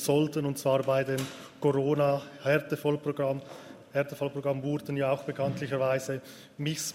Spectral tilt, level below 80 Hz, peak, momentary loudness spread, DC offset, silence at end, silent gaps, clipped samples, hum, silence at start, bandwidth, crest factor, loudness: -5.5 dB/octave; -70 dBFS; -12 dBFS; 10 LU; under 0.1%; 0 s; none; under 0.1%; none; 0 s; 16 kHz; 18 dB; -30 LUFS